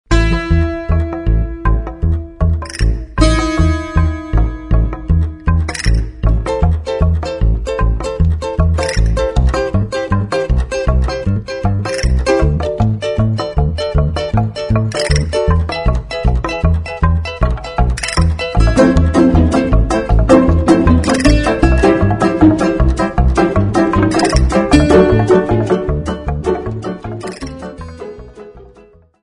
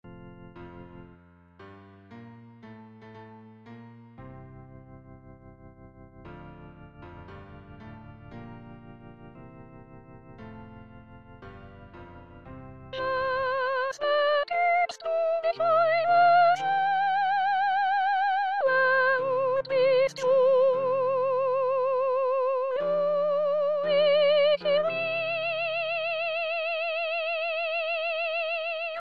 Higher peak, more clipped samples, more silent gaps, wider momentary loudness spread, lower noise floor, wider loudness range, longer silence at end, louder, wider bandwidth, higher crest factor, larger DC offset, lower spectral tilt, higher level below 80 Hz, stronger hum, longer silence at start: first, 0 dBFS vs -12 dBFS; neither; neither; second, 8 LU vs 25 LU; second, -44 dBFS vs -55 dBFS; second, 5 LU vs 23 LU; first, 0.6 s vs 0 s; first, -14 LUFS vs -25 LUFS; first, 11 kHz vs 7.6 kHz; about the same, 14 dB vs 16 dB; neither; first, -6.5 dB/octave vs -4.5 dB/octave; first, -18 dBFS vs -60 dBFS; neither; about the same, 0.1 s vs 0.05 s